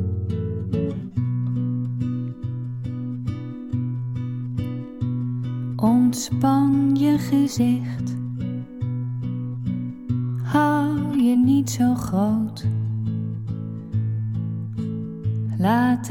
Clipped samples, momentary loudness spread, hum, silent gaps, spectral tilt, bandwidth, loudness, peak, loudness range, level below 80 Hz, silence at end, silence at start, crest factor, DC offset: under 0.1%; 11 LU; none; none; -7 dB/octave; 17 kHz; -23 LUFS; -6 dBFS; 7 LU; -52 dBFS; 0 s; 0 s; 16 dB; under 0.1%